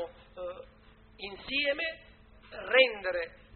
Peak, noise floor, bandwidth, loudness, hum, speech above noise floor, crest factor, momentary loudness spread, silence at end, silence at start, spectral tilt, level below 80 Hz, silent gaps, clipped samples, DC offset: -8 dBFS; -58 dBFS; 4.5 kHz; -28 LUFS; none; 28 dB; 24 dB; 22 LU; 0 s; 0 s; 1 dB/octave; -60 dBFS; none; under 0.1%; under 0.1%